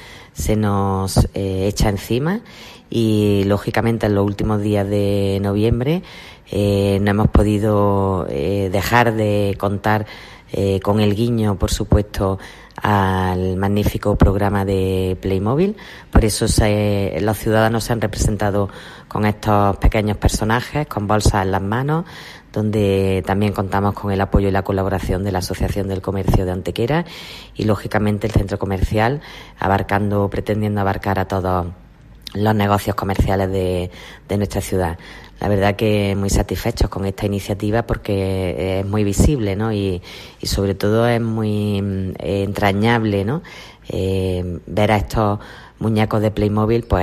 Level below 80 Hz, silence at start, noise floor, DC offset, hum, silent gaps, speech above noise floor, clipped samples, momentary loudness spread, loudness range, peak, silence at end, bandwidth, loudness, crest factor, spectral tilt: -30 dBFS; 0 s; -39 dBFS; under 0.1%; none; none; 21 dB; under 0.1%; 8 LU; 3 LU; -2 dBFS; 0 s; 15 kHz; -19 LUFS; 16 dB; -6.5 dB/octave